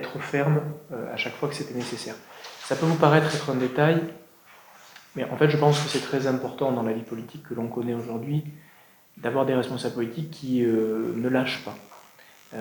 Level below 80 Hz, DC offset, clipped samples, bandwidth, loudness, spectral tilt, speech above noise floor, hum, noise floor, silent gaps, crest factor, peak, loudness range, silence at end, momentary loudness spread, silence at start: -72 dBFS; under 0.1%; under 0.1%; over 20 kHz; -26 LUFS; -6 dB/octave; 28 dB; none; -54 dBFS; none; 22 dB; -4 dBFS; 5 LU; 0 s; 16 LU; 0 s